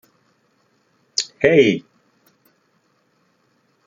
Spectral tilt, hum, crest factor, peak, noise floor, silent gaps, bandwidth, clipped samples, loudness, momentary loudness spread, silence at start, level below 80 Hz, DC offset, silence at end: -4 dB/octave; none; 22 dB; 0 dBFS; -64 dBFS; none; 9.4 kHz; under 0.1%; -17 LUFS; 12 LU; 1.2 s; -60 dBFS; under 0.1%; 2.05 s